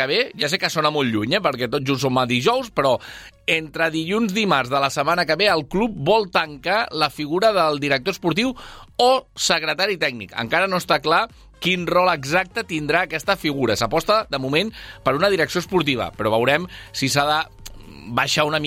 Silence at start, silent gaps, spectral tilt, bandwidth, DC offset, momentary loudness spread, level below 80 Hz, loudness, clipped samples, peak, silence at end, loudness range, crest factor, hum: 0 s; none; -4 dB/octave; 16.5 kHz; under 0.1%; 6 LU; -48 dBFS; -20 LUFS; under 0.1%; -4 dBFS; 0 s; 1 LU; 18 dB; none